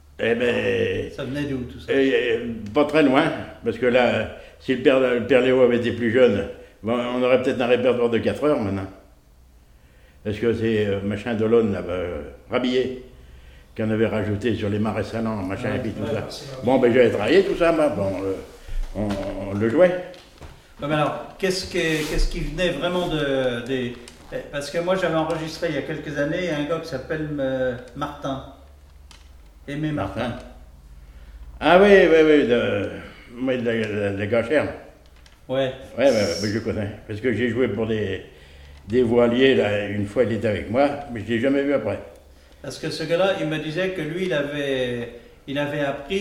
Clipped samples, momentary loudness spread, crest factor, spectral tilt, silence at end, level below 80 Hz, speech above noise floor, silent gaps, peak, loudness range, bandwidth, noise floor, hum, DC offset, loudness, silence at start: under 0.1%; 13 LU; 22 dB; -6 dB/octave; 0 s; -40 dBFS; 30 dB; none; -2 dBFS; 7 LU; 14.5 kHz; -51 dBFS; none; under 0.1%; -22 LUFS; 0.2 s